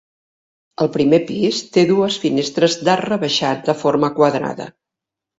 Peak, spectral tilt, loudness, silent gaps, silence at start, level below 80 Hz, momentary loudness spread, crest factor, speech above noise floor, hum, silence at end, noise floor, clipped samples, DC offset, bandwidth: 0 dBFS; -5 dB/octave; -17 LUFS; none; 0.8 s; -60 dBFS; 7 LU; 18 dB; 68 dB; none; 0.7 s; -85 dBFS; under 0.1%; under 0.1%; 8 kHz